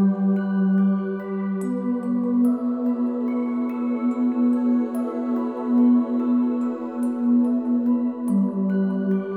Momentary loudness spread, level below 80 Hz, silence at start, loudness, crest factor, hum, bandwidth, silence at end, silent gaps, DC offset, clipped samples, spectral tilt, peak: 6 LU; -72 dBFS; 0 s; -22 LUFS; 12 dB; none; 3.1 kHz; 0 s; none; under 0.1%; under 0.1%; -10 dB/octave; -10 dBFS